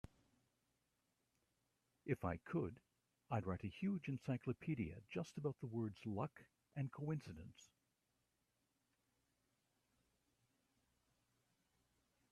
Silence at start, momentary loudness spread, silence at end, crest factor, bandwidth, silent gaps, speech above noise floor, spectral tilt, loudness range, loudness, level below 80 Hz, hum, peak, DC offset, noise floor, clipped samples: 2.05 s; 12 LU; 4.65 s; 24 dB; 13 kHz; none; 41 dB; -8 dB/octave; 8 LU; -46 LUFS; -76 dBFS; none; -26 dBFS; under 0.1%; -87 dBFS; under 0.1%